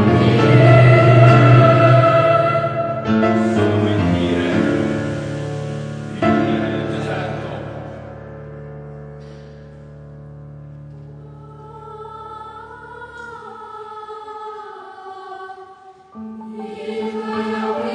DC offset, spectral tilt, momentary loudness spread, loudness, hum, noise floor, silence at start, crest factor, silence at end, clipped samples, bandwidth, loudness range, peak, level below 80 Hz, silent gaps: under 0.1%; -8 dB/octave; 27 LU; -15 LUFS; none; -43 dBFS; 0 s; 18 dB; 0 s; under 0.1%; 9.2 kHz; 24 LU; 0 dBFS; -44 dBFS; none